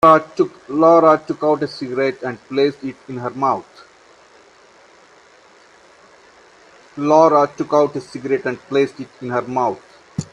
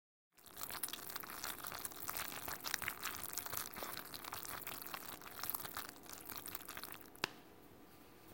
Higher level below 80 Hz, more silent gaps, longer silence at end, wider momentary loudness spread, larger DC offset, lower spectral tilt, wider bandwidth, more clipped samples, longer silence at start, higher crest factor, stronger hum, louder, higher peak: first, -60 dBFS vs -72 dBFS; neither; about the same, 0.1 s vs 0 s; about the same, 16 LU vs 15 LU; neither; first, -6.5 dB/octave vs -1 dB/octave; second, 10 kHz vs 17 kHz; neither; second, 0.05 s vs 0.3 s; second, 18 dB vs 30 dB; neither; first, -17 LUFS vs -44 LUFS; first, 0 dBFS vs -16 dBFS